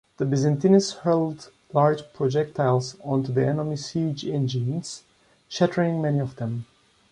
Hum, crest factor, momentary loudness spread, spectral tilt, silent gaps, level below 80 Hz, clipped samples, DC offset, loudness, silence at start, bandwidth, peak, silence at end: none; 18 dB; 11 LU; -6.5 dB/octave; none; -62 dBFS; under 0.1%; under 0.1%; -24 LUFS; 0.2 s; 10.5 kHz; -6 dBFS; 0.5 s